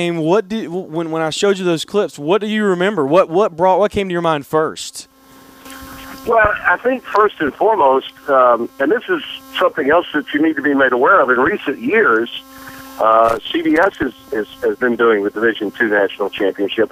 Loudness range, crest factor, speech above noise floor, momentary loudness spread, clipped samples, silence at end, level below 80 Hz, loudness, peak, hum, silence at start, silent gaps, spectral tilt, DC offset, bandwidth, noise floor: 3 LU; 14 dB; 28 dB; 11 LU; under 0.1%; 0.05 s; -48 dBFS; -15 LUFS; 0 dBFS; none; 0 s; none; -5 dB/octave; under 0.1%; 16 kHz; -44 dBFS